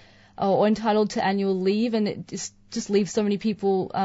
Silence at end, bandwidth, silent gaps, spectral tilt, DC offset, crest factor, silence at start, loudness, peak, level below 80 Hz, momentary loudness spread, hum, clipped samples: 0 s; 8 kHz; none; -5.5 dB/octave; under 0.1%; 14 dB; 0.4 s; -24 LUFS; -10 dBFS; -60 dBFS; 11 LU; none; under 0.1%